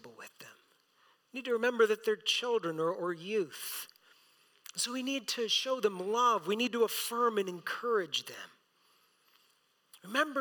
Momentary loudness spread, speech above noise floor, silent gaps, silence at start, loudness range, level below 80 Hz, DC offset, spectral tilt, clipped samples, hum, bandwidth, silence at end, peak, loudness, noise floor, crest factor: 20 LU; 39 dB; none; 0.05 s; 4 LU; under -90 dBFS; under 0.1%; -2.5 dB/octave; under 0.1%; none; 19 kHz; 0 s; -14 dBFS; -32 LUFS; -72 dBFS; 20 dB